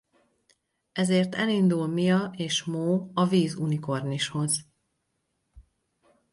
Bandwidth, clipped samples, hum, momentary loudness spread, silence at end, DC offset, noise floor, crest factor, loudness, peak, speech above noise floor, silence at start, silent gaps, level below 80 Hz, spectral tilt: 11.5 kHz; under 0.1%; none; 6 LU; 0.7 s; under 0.1%; -77 dBFS; 16 dB; -26 LUFS; -10 dBFS; 52 dB; 0.95 s; none; -64 dBFS; -5 dB/octave